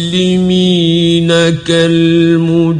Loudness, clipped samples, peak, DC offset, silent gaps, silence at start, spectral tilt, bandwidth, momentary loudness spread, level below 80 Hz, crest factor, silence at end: -10 LUFS; under 0.1%; 0 dBFS; under 0.1%; none; 0 s; -6 dB/octave; 11 kHz; 2 LU; -42 dBFS; 10 dB; 0 s